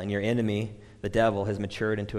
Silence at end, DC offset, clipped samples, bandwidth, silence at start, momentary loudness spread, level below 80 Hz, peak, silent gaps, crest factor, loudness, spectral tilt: 0 s; under 0.1%; under 0.1%; 12 kHz; 0 s; 9 LU; -50 dBFS; -12 dBFS; none; 16 dB; -28 LUFS; -7 dB/octave